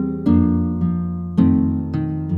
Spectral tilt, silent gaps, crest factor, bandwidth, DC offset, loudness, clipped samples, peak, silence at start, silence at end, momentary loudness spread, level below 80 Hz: -11.5 dB/octave; none; 14 dB; 4.4 kHz; under 0.1%; -19 LUFS; under 0.1%; -4 dBFS; 0 s; 0 s; 7 LU; -36 dBFS